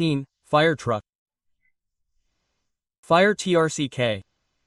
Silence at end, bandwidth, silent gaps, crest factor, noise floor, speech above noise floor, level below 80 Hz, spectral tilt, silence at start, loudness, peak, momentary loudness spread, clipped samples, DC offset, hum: 0.45 s; 12 kHz; 1.15-1.26 s, 2.98-3.03 s; 20 dB; -78 dBFS; 56 dB; -62 dBFS; -5 dB/octave; 0 s; -22 LUFS; -4 dBFS; 10 LU; under 0.1%; under 0.1%; none